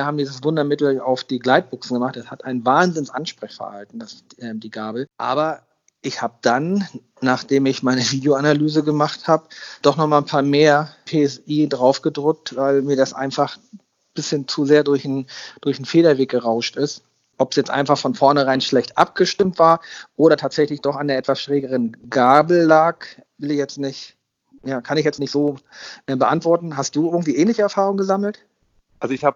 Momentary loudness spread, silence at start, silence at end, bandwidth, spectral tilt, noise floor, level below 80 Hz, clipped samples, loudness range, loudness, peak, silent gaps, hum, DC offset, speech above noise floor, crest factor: 16 LU; 0 s; 0.05 s; 7.6 kHz; -5.5 dB/octave; -61 dBFS; -66 dBFS; under 0.1%; 6 LU; -19 LUFS; 0 dBFS; none; none; under 0.1%; 43 dB; 18 dB